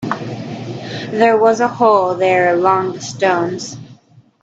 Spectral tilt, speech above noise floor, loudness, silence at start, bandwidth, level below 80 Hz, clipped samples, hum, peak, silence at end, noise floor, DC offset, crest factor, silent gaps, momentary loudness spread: -5 dB/octave; 33 dB; -15 LUFS; 0 s; 8 kHz; -60 dBFS; under 0.1%; none; 0 dBFS; 0.5 s; -47 dBFS; under 0.1%; 16 dB; none; 14 LU